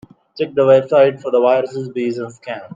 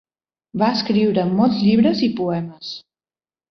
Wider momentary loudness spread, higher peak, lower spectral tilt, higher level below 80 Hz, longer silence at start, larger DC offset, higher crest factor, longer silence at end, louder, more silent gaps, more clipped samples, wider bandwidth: about the same, 15 LU vs 16 LU; first, 0 dBFS vs -4 dBFS; about the same, -7 dB/octave vs -7.5 dB/octave; second, -66 dBFS vs -58 dBFS; second, 0.35 s vs 0.55 s; neither; about the same, 16 dB vs 16 dB; second, 0.1 s vs 0.7 s; first, -15 LUFS vs -18 LUFS; neither; neither; first, 7.6 kHz vs 6.4 kHz